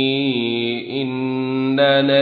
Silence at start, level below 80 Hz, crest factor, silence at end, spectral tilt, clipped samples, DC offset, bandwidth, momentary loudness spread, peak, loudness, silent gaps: 0 s; -64 dBFS; 14 dB; 0 s; -8 dB/octave; under 0.1%; under 0.1%; 4.7 kHz; 8 LU; -4 dBFS; -19 LUFS; none